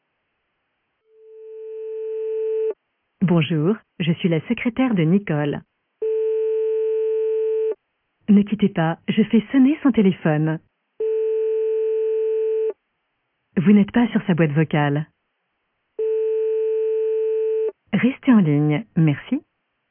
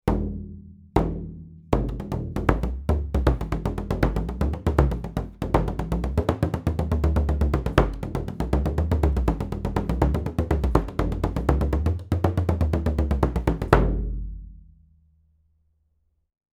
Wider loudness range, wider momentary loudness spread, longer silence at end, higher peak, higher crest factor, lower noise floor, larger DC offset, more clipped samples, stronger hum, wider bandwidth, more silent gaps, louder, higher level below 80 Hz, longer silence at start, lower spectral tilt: about the same, 4 LU vs 3 LU; first, 11 LU vs 8 LU; second, 0.5 s vs 1.95 s; second, -4 dBFS vs 0 dBFS; second, 16 dB vs 24 dB; first, -73 dBFS vs -69 dBFS; neither; neither; neither; second, 3.5 kHz vs 14 kHz; neither; first, -21 LUFS vs -25 LUFS; second, -60 dBFS vs -28 dBFS; first, 1.3 s vs 0.05 s; first, -12 dB/octave vs -8.5 dB/octave